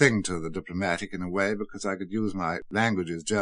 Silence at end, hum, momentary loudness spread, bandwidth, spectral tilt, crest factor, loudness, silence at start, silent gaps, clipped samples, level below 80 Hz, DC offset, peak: 0 s; none; 6 LU; 10 kHz; -5 dB/octave; 24 dB; -29 LUFS; 0 s; none; under 0.1%; -54 dBFS; under 0.1%; -4 dBFS